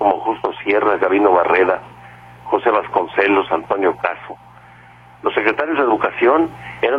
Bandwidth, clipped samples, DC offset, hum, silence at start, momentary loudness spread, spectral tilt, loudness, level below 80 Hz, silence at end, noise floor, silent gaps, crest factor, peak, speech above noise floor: 5.6 kHz; under 0.1%; under 0.1%; 60 Hz at -45 dBFS; 0 s; 10 LU; -7 dB/octave; -17 LUFS; -54 dBFS; 0 s; -44 dBFS; none; 18 dB; 0 dBFS; 27 dB